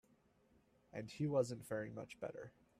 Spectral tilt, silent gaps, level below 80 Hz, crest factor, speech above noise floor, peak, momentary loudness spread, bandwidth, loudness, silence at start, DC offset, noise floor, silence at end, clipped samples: -6.5 dB/octave; none; -78 dBFS; 20 dB; 31 dB; -24 dBFS; 14 LU; 14 kHz; -44 LUFS; 0.95 s; under 0.1%; -74 dBFS; 0.3 s; under 0.1%